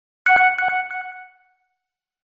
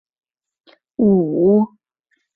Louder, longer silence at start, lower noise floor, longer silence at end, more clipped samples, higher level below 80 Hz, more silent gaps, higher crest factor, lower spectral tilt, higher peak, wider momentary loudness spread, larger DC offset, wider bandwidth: about the same, -17 LUFS vs -16 LUFS; second, 0.25 s vs 1 s; first, -82 dBFS vs -69 dBFS; first, 1 s vs 0.7 s; neither; second, -64 dBFS vs -56 dBFS; neither; about the same, 16 dB vs 14 dB; second, 2.5 dB/octave vs -14 dB/octave; about the same, -6 dBFS vs -4 dBFS; first, 16 LU vs 10 LU; neither; first, 7.4 kHz vs 3.3 kHz